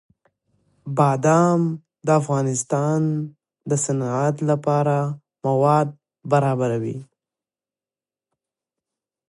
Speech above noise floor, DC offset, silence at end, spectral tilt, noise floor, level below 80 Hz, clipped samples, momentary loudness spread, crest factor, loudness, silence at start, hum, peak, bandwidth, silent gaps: over 70 dB; under 0.1%; 2.25 s; -7 dB/octave; under -90 dBFS; -68 dBFS; under 0.1%; 12 LU; 18 dB; -21 LUFS; 0.85 s; none; -4 dBFS; 11.5 kHz; none